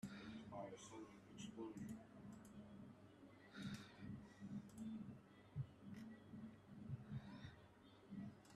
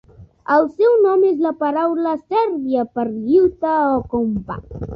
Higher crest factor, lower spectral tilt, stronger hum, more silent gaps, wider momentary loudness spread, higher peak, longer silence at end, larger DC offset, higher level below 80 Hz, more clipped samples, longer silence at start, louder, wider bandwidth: about the same, 18 dB vs 14 dB; second, -6 dB/octave vs -9.5 dB/octave; neither; neither; about the same, 8 LU vs 9 LU; second, -38 dBFS vs -4 dBFS; about the same, 0 s vs 0 s; neither; second, -78 dBFS vs -44 dBFS; neither; second, 0 s vs 0.2 s; second, -57 LUFS vs -18 LUFS; first, 13 kHz vs 5.6 kHz